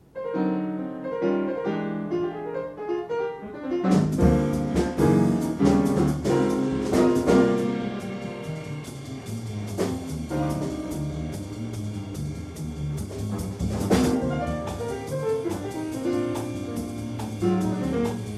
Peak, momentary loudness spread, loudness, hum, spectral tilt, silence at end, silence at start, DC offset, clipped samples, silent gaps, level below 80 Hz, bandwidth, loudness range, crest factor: -6 dBFS; 12 LU; -26 LUFS; none; -7 dB/octave; 0 s; 0.15 s; under 0.1%; under 0.1%; none; -42 dBFS; 14 kHz; 9 LU; 18 dB